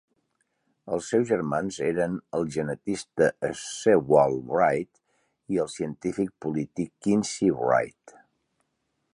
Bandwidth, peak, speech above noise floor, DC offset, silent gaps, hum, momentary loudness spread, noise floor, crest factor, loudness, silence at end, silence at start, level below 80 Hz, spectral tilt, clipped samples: 11 kHz; -6 dBFS; 51 dB; under 0.1%; none; none; 10 LU; -77 dBFS; 22 dB; -26 LUFS; 1.05 s; 0.85 s; -60 dBFS; -5.5 dB/octave; under 0.1%